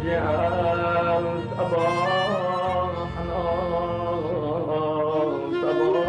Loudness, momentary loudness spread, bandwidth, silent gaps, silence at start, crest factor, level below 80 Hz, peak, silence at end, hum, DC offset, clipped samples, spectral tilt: -24 LUFS; 5 LU; 10 kHz; none; 0 s; 12 dB; -46 dBFS; -12 dBFS; 0 s; none; under 0.1%; under 0.1%; -7 dB/octave